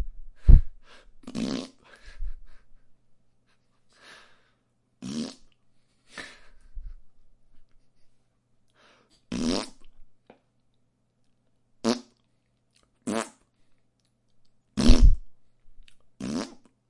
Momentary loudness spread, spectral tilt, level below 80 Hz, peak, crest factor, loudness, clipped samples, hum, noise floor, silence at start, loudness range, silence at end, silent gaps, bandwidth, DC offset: 27 LU; -6 dB/octave; -30 dBFS; 0 dBFS; 26 dB; -28 LUFS; under 0.1%; none; -70 dBFS; 0 s; 20 LU; 0.45 s; none; 11 kHz; under 0.1%